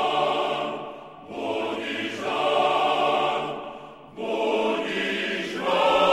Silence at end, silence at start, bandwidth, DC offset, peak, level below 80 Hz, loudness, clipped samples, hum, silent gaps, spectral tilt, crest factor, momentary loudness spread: 0 s; 0 s; 14 kHz; under 0.1%; -8 dBFS; -64 dBFS; -25 LUFS; under 0.1%; none; none; -4 dB/octave; 16 dB; 15 LU